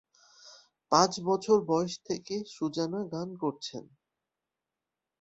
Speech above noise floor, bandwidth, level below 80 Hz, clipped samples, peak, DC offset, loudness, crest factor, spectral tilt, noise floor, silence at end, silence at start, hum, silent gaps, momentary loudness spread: 59 dB; 8.2 kHz; -72 dBFS; under 0.1%; -6 dBFS; under 0.1%; -30 LUFS; 24 dB; -4.5 dB/octave; -89 dBFS; 1.4 s; 0.45 s; none; none; 12 LU